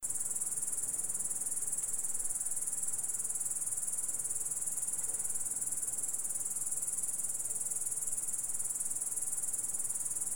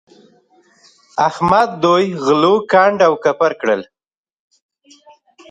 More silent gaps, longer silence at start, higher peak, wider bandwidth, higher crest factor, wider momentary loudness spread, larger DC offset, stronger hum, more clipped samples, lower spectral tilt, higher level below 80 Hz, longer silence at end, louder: neither; second, 0 s vs 1.15 s; second, -20 dBFS vs 0 dBFS; first, over 20 kHz vs 10.5 kHz; about the same, 16 dB vs 16 dB; second, 1 LU vs 7 LU; first, 0.6% vs under 0.1%; neither; neither; second, 0 dB/octave vs -5.5 dB/octave; second, -66 dBFS vs -56 dBFS; second, 0 s vs 1.65 s; second, -33 LUFS vs -14 LUFS